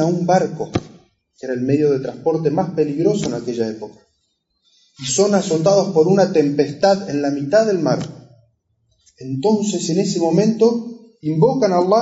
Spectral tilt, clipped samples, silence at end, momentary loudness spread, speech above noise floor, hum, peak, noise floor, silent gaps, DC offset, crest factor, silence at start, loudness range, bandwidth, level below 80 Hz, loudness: -6 dB/octave; under 0.1%; 0 s; 12 LU; 52 dB; none; -2 dBFS; -69 dBFS; none; under 0.1%; 14 dB; 0 s; 4 LU; 8 kHz; -58 dBFS; -18 LUFS